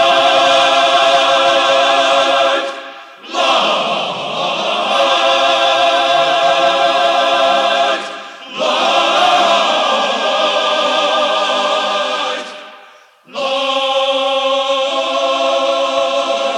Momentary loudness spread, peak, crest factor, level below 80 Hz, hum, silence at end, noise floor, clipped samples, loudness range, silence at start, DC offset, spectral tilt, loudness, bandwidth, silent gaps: 9 LU; 0 dBFS; 14 dB; -78 dBFS; none; 0 s; -43 dBFS; under 0.1%; 4 LU; 0 s; under 0.1%; -1.5 dB/octave; -13 LUFS; 12 kHz; none